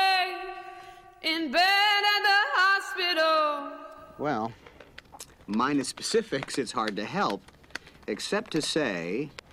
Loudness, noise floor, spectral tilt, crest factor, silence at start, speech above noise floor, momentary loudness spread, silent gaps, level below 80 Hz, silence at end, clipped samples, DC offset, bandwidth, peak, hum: -26 LUFS; -50 dBFS; -3 dB/octave; 14 dB; 0 s; 20 dB; 21 LU; none; -64 dBFS; 0.2 s; under 0.1%; under 0.1%; 16 kHz; -14 dBFS; none